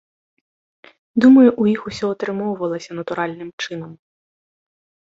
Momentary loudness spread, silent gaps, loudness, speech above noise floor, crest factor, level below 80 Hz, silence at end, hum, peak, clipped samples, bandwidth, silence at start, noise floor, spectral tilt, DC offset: 17 LU; 3.53-3.58 s; -18 LUFS; over 73 dB; 18 dB; -60 dBFS; 1.2 s; none; -2 dBFS; under 0.1%; 7.6 kHz; 1.15 s; under -90 dBFS; -6.5 dB/octave; under 0.1%